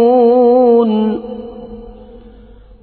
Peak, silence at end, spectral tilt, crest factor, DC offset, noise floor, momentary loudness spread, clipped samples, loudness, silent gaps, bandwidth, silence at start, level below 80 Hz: -2 dBFS; 0.9 s; -11.5 dB/octave; 12 dB; under 0.1%; -39 dBFS; 23 LU; under 0.1%; -11 LUFS; none; 4.5 kHz; 0 s; -42 dBFS